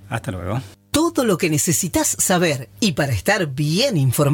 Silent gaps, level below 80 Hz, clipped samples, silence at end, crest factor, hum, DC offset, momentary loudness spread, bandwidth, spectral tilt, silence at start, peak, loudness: none; -46 dBFS; under 0.1%; 0 s; 16 dB; none; under 0.1%; 10 LU; 17 kHz; -4 dB/octave; 0 s; -4 dBFS; -19 LUFS